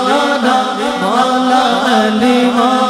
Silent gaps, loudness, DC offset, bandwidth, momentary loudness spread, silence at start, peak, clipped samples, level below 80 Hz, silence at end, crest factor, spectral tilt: none; -12 LUFS; under 0.1%; 15 kHz; 3 LU; 0 s; 0 dBFS; under 0.1%; -52 dBFS; 0 s; 12 dB; -4 dB/octave